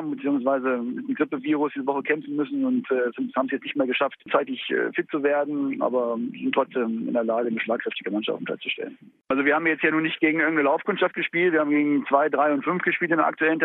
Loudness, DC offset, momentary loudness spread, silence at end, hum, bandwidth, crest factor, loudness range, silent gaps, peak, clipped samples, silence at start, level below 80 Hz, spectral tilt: -24 LUFS; under 0.1%; 7 LU; 0 s; none; 4 kHz; 18 dB; 4 LU; none; -6 dBFS; under 0.1%; 0 s; -76 dBFS; -9 dB/octave